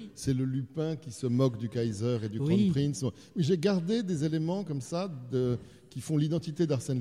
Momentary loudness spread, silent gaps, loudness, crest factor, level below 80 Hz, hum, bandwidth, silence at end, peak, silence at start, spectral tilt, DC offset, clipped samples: 8 LU; none; -31 LUFS; 16 dB; -60 dBFS; none; 14 kHz; 0 s; -14 dBFS; 0 s; -7 dB/octave; under 0.1%; under 0.1%